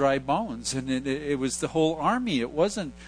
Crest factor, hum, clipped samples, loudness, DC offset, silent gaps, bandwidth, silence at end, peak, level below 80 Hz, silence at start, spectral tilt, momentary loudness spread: 18 dB; none; under 0.1%; -27 LUFS; under 0.1%; none; 10.5 kHz; 0 s; -10 dBFS; -52 dBFS; 0 s; -4.5 dB/octave; 5 LU